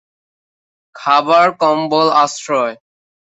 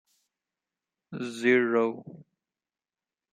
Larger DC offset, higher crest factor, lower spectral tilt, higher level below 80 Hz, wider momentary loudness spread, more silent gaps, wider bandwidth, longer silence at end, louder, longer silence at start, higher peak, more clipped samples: neither; second, 14 dB vs 22 dB; second, -3.5 dB/octave vs -5.5 dB/octave; first, -66 dBFS vs -82 dBFS; second, 7 LU vs 20 LU; neither; second, 8.2 kHz vs 10 kHz; second, 0.55 s vs 1.1 s; first, -14 LUFS vs -26 LUFS; second, 0.95 s vs 1.1 s; first, -2 dBFS vs -10 dBFS; neither